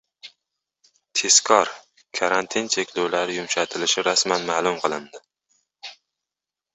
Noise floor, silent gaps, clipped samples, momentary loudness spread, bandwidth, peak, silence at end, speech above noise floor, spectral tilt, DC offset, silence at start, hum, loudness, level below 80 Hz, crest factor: -88 dBFS; none; under 0.1%; 17 LU; 8.2 kHz; 0 dBFS; 0.8 s; 66 dB; -1 dB/octave; under 0.1%; 0.25 s; none; -21 LUFS; -68 dBFS; 24 dB